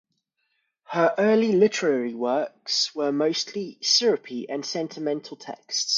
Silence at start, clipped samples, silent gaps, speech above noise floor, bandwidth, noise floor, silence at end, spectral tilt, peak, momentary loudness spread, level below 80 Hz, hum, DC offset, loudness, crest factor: 0.9 s; under 0.1%; none; 51 dB; 7.6 kHz; -75 dBFS; 0 s; -3 dB/octave; -6 dBFS; 11 LU; -76 dBFS; none; under 0.1%; -24 LUFS; 18 dB